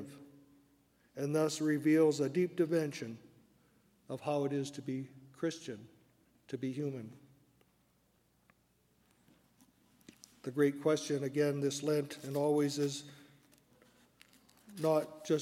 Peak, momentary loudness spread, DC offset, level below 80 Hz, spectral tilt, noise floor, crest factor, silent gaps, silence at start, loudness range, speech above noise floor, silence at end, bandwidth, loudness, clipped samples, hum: -18 dBFS; 17 LU; under 0.1%; -82 dBFS; -5.5 dB/octave; -73 dBFS; 18 dB; none; 0 s; 13 LU; 39 dB; 0 s; 16 kHz; -34 LUFS; under 0.1%; 60 Hz at -70 dBFS